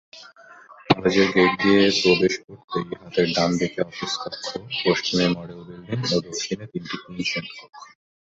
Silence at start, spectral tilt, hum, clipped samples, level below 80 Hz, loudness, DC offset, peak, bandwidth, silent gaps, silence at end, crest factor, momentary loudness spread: 0.15 s; -4.5 dB/octave; none; under 0.1%; -56 dBFS; -22 LUFS; under 0.1%; -2 dBFS; 8 kHz; 2.44-2.48 s, 2.64-2.68 s; 0.4 s; 22 dB; 14 LU